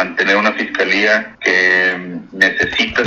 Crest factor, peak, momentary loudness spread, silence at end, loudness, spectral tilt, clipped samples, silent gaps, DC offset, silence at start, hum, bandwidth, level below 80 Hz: 16 dB; 0 dBFS; 6 LU; 0 s; -13 LUFS; -3.5 dB/octave; under 0.1%; none; under 0.1%; 0 s; none; 12 kHz; -48 dBFS